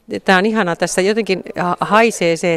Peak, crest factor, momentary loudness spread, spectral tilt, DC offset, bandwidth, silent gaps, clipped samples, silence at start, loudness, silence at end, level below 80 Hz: 0 dBFS; 16 dB; 6 LU; -4.5 dB/octave; under 0.1%; 15 kHz; none; under 0.1%; 0.1 s; -15 LUFS; 0 s; -54 dBFS